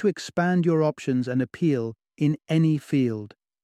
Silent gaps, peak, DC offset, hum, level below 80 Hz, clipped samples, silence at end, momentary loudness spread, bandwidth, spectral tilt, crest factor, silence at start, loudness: none; -10 dBFS; under 0.1%; none; -66 dBFS; under 0.1%; 0.35 s; 6 LU; 11 kHz; -7.5 dB/octave; 14 dB; 0 s; -24 LUFS